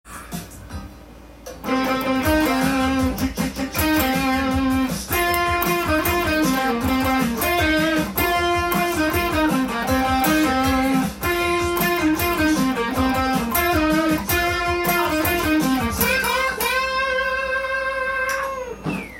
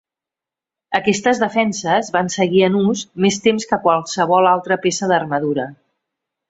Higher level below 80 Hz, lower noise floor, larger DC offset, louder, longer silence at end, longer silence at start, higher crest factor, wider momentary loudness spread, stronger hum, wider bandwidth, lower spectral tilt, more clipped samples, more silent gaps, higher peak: first, -38 dBFS vs -60 dBFS; second, -42 dBFS vs -88 dBFS; neither; second, -20 LUFS vs -17 LUFS; second, 0 s vs 0.75 s; second, 0.05 s vs 0.9 s; about the same, 16 dB vs 18 dB; about the same, 6 LU vs 6 LU; neither; first, 17 kHz vs 8 kHz; about the same, -4.5 dB/octave vs -4.5 dB/octave; neither; neither; second, -4 dBFS vs 0 dBFS